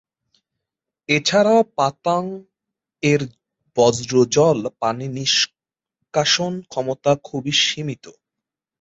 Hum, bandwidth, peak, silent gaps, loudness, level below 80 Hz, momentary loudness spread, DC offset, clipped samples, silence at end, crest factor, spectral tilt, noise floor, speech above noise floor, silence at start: none; 8 kHz; -4 dBFS; none; -19 LUFS; -60 dBFS; 12 LU; under 0.1%; under 0.1%; 0.7 s; 18 dB; -4 dB/octave; -85 dBFS; 66 dB; 1.1 s